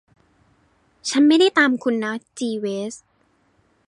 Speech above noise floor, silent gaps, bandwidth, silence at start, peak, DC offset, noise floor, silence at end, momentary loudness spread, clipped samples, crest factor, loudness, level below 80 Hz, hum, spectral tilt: 44 dB; none; 11.5 kHz; 1.05 s; -4 dBFS; under 0.1%; -63 dBFS; 0.9 s; 16 LU; under 0.1%; 18 dB; -19 LUFS; -70 dBFS; none; -3.5 dB/octave